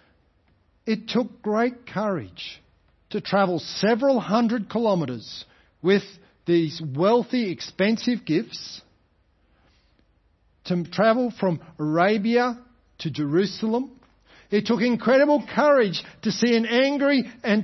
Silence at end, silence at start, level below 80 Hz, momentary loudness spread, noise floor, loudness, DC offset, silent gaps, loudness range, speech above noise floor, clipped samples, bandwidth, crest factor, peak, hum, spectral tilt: 0 s; 0.85 s; -64 dBFS; 15 LU; -64 dBFS; -23 LUFS; under 0.1%; none; 6 LU; 42 dB; under 0.1%; 6.2 kHz; 18 dB; -4 dBFS; none; -6 dB/octave